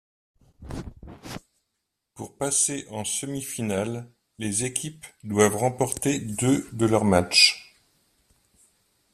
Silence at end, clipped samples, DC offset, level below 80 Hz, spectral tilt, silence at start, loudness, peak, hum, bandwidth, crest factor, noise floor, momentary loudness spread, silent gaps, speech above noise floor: 1.5 s; under 0.1%; under 0.1%; -54 dBFS; -3 dB/octave; 0.6 s; -23 LUFS; -4 dBFS; none; 15 kHz; 24 dB; -80 dBFS; 22 LU; none; 56 dB